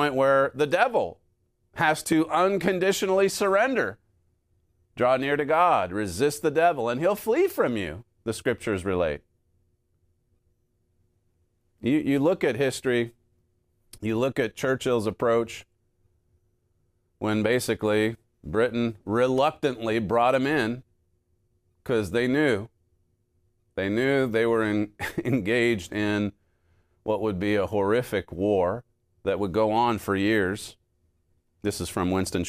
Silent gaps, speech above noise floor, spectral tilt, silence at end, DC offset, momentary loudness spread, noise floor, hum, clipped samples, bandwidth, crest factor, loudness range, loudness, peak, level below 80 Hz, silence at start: none; 46 dB; -5.5 dB/octave; 0 s; under 0.1%; 10 LU; -70 dBFS; none; under 0.1%; 15.5 kHz; 18 dB; 5 LU; -25 LUFS; -8 dBFS; -56 dBFS; 0 s